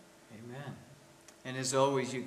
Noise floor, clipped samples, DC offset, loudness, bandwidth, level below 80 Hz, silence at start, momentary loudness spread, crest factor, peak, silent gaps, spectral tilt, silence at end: -58 dBFS; under 0.1%; under 0.1%; -33 LUFS; 15.5 kHz; -78 dBFS; 0.3 s; 22 LU; 22 dB; -14 dBFS; none; -4 dB/octave; 0 s